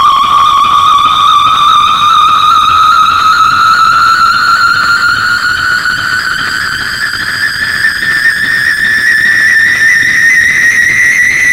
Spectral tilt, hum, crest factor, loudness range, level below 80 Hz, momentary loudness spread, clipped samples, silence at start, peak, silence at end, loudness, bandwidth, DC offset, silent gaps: -0.5 dB/octave; none; 8 dB; 4 LU; -38 dBFS; 6 LU; 0.2%; 0 s; 0 dBFS; 0 s; -6 LUFS; 16.5 kHz; 0.4%; none